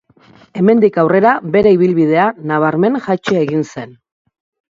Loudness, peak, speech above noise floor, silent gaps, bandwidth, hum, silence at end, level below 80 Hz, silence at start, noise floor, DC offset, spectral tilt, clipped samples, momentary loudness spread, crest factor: -13 LUFS; 0 dBFS; 34 dB; none; 7.6 kHz; none; 0.8 s; -52 dBFS; 0.55 s; -46 dBFS; under 0.1%; -8 dB/octave; under 0.1%; 11 LU; 14 dB